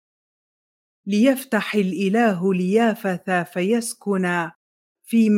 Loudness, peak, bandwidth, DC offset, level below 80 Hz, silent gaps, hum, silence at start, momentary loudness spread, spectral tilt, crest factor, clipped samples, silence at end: -21 LUFS; -6 dBFS; 16.5 kHz; under 0.1%; -72 dBFS; 4.56-4.95 s; none; 1.05 s; 6 LU; -6 dB/octave; 16 dB; under 0.1%; 0 s